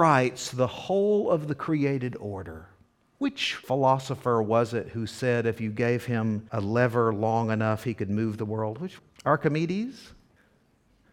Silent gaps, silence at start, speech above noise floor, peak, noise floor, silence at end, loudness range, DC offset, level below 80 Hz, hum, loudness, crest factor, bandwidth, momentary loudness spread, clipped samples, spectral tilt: none; 0 s; 38 dB; -6 dBFS; -64 dBFS; 1.05 s; 2 LU; under 0.1%; -62 dBFS; none; -27 LUFS; 20 dB; 15.5 kHz; 10 LU; under 0.1%; -6.5 dB/octave